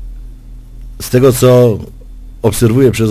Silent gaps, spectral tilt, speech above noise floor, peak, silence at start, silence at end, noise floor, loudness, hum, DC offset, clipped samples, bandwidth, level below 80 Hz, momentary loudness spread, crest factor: none; -6.5 dB/octave; 22 dB; 0 dBFS; 0 s; 0 s; -31 dBFS; -10 LUFS; none; under 0.1%; 0.5%; 15.5 kHz; -30 dBFS; 19 LU; 12 dB